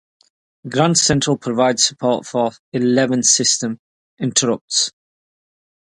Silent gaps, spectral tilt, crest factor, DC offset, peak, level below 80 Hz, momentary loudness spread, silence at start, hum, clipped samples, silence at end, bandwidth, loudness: 2.59-2.72 s, 3.79-4.17 s, 4.61-4.68 s; -3 dB/octave; 20 dB; under 0.1%; 0 dBFS; -54 dBFS; 9 LU; 0.65 s; none; under 0.1%; 1.05 s; 11.5 kHz; -17 LUFS